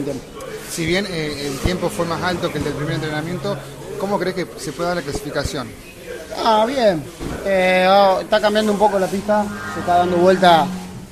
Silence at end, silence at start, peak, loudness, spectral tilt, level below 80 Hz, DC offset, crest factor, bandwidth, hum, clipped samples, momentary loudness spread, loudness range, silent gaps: 0 s; 0 s; 0 dBFS; -18 LUFS; -5 dB/octave; -40 dBFS; under 0.1%; 18 dB; 14.5 kHz; none; under 0.1%; 16 LU; 8 LU; none